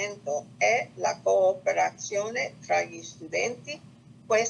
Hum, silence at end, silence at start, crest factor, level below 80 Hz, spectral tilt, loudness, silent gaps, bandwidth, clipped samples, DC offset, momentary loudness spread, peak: 60 Hz at -55 dBFS; 0 s; 0 s; 16 dB; -74 dBFS; -2.5 dB/octave; -27 LUFS; none; 9.6 kHz; under 0.1%; under 0.1%; 13 LU; -12 dBFS